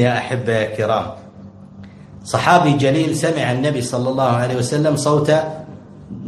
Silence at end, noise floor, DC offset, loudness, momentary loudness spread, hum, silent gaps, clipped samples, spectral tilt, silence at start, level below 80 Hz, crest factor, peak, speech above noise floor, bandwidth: 0 s; -39 dBFS; under 0.1%; -17 LUFS; 17 LU; none; none; under 0.1%; -5.5 dB/octave; 0 s; -52 dBFS; 18 dB; 0 dBFS; 22 dB; 12.5 kHz